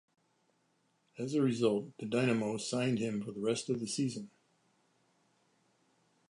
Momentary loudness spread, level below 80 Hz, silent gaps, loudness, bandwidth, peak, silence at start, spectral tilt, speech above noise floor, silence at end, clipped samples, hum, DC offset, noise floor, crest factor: 7 LU; -78 dBFS; none; -34 LUFS; 11.5 kHz; -16 dBFS; 1.15 s; -5.5 dB/octave; 42 dB; 2.05 s; under 0.1%; none; under 0.1%; -76 dBFS; 20 dB